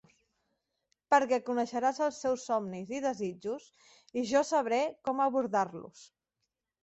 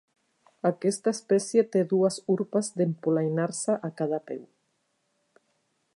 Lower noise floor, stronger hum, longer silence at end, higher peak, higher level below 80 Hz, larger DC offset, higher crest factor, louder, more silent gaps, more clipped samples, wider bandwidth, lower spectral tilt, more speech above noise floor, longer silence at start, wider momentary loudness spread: first, -85 dBFS vs -75 dBFS; neither; second, 0.8 s vs 1.55 s; about the same, -12 dBFS vs -10 dBFS; about the same, -76 dBFS vs -80 dBFS; neither; about the same, 20 dB vs 18 dB; second, -31 LUFS vs -27 LUFS; neither; neither; second, 8.2 kHz vs 11.5 kHz; second, -4.5 dB/octave vs -6 dB/octave; first, 54 dB vs 48 dB; first, 1.1 s vs 0.65 s; first, 12 LU vs 6 LU